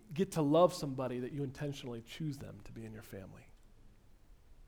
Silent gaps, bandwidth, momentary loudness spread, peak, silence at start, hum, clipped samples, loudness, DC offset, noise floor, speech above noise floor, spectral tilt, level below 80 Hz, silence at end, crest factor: none; 19 kHz; 21 LU; -14 dBFS; 0.1 s; none; under 0.1%; -35 LUFS; under 0.1%; -60 dBFS; 24 dB; -6.5 dB/octave; -60 dBFS; 0 s; 22 dB